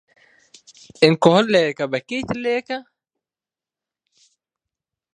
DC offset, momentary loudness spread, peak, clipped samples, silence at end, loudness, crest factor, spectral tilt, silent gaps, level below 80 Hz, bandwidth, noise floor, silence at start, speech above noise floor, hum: under 0.1%; 12 LU; 0 dBFS; under 0.1%; 2.35 s; -19 LUFS; 22 dB; -5.5 dB/octave; none; -60 dBFS; 10 kHz; under -90 dBFS; 1 s; over 72 dB; none